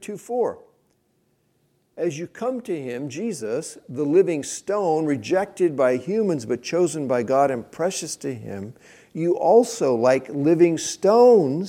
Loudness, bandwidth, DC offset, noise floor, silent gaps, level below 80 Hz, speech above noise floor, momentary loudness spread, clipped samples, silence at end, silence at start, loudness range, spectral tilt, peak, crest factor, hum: -22 LUFS; 15.5 kHz; under 0.1%; -67 dBFS; none; -70 dBFS; 46 dB; 13 LU; under 0.1%; 0 s; 0 s; 9 LU; -5.5 dB/octave; -4 dBFS; 18 dB; none